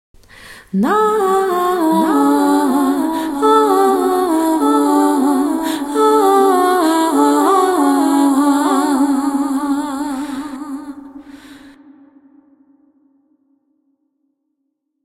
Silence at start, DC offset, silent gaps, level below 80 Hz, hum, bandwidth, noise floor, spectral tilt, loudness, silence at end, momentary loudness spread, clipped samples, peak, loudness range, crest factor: 0.4 s; under 0.1%; none; -54 dBFS; none; 16 kHz; -72 dBFS; -4.5 dB/octave; -14 LUFS; 3.35 s; 10 LU; under 0.1%; -2 dBFS; 11 LU; 14 dB